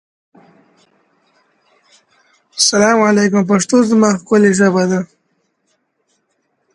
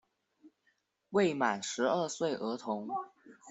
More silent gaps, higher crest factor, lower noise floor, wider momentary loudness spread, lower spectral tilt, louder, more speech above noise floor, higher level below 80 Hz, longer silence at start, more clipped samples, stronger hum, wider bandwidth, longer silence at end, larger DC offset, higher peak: neither; about the same, 16 dB vs 20 dB; second, -66 dBFS vs -77 dBFS; about the same, 8 LU vs 9 LU; about the same, -4.5 dB/octave vs -4 dB/octave; first, -12 LUFS vs -33 LUFS; first, 54 dB vs 44 dB; first, -60 dBFS vs -80 dBFS; first, 2.55 s vs 0.45 s; neither; neither; first, 11.5 kHz vs 8.2 kHz; first, 1.7 s vs 0 s; neither; first, 0 dBFS vs -14 dBFS